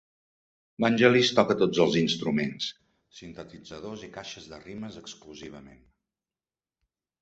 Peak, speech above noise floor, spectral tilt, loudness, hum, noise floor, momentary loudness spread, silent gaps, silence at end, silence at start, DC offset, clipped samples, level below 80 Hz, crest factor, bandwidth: -4 dBFS; over 63 dB; -5 dB/octave; -24 LUFS; none; under -90 dBFS; 23 LU; none; 1.55 s; 0.8 s; under 0.1%; under 0.1%; -64 dBFS; 26 dB; 8.2 kHz